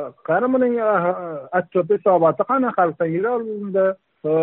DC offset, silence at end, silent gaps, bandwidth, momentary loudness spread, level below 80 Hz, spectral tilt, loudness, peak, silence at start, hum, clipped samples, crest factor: under 0.1%; 0 s; none; 4 kHz; 7 LU; -68 dBFS; -7 dB/octave; -20 LUFS; -4 dBFS; 0 s; none; under 0.1%; 14 dB